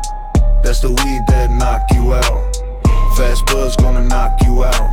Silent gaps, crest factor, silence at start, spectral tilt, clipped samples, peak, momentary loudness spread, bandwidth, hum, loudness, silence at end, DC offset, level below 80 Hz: none; 10 dB; 0 s; -5 dB/octave; under 0.1%; -2 dBFS; 3 LU; 16 kHz; none; -15 LUFS; 0 s; under 0.1%; -12 dBFS